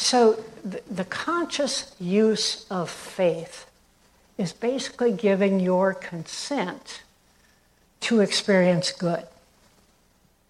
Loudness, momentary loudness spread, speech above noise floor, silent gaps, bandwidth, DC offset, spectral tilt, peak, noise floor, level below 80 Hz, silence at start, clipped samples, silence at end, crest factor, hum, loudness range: -24 LUFS; 14 LU; 38 dB; none; 12.5 kHz; under 0.1%; -4.5 dB/octave; -8 dBFS; -62 dBFS; -66 dBFS; 0 s; under 0.1%; 1.2 s; 18 dB; none; 1 LU